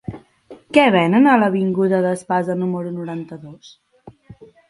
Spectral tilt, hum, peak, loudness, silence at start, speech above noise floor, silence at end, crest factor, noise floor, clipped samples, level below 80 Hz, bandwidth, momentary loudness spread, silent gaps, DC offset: -7 dB/octave; none; 0 dBFS; -17 LUFS; 0.1 s; 27 dB; 0.35 s; 18 dB; -44 dBFS; under 0.1%; -58 dBFS; 11.5 kHz; 17 LU; none; under 0.1%